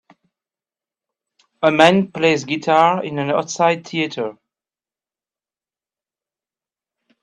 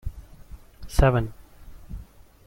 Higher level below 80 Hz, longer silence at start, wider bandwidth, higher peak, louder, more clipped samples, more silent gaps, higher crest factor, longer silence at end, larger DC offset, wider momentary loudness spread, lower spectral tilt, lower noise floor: second, -64 dBFS vs -32 dBFS; first, 1.6 s vs 0.05 s; second, 11 kHz vs 16.5 kHz; first, 0 dBFS vs -4 dBFS; first, -17 LUFS vs -24 LUFS; neither; neither; about the same, 20 dB vs 22 dB; first, 2.9 s vs 0.45 s; neither; second, 10 LU vs 22 LU; second, -5 dB/octave vs -7 dB/octave; first, under -90 dBFS vs -45 dBFS